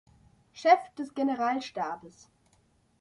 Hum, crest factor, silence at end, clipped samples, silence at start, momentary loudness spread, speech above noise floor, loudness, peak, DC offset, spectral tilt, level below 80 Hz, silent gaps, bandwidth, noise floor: none; 22 dB; 0.9 s; under 0.1%; 0.55 s; 13 LU; 39 dB; -28 LUFS; -8 dBFS; under 0.1%; -4.5 dB/octave; -72 dBFS; none; 11 kHz; -67 dBFS